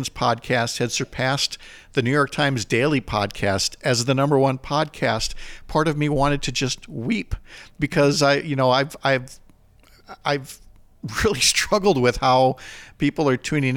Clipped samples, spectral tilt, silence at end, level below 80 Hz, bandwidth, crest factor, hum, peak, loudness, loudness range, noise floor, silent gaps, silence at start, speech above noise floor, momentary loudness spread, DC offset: under 0.1%; -4.5 dB/octave; 0 s; -42 dBFS; 18 kHz; 16 dB; none; -6 dBFS; -21 LUFS; 2 LU; -52 dBFS; none; 0 s; 31 dB; 11 LU; under 0.1%